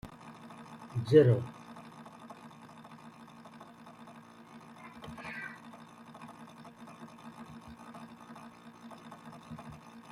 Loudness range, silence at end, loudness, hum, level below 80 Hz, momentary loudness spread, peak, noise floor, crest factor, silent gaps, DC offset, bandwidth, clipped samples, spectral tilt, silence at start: 19 LU; 0 s; -30 LUFS; none; -70 dBFS; 20 LU; -10 dBFS; -53 dBFS; 26 dB; none; under 0.1%; 12.5 kHz; under 0.1%; -8 dB/octave; 0.05 s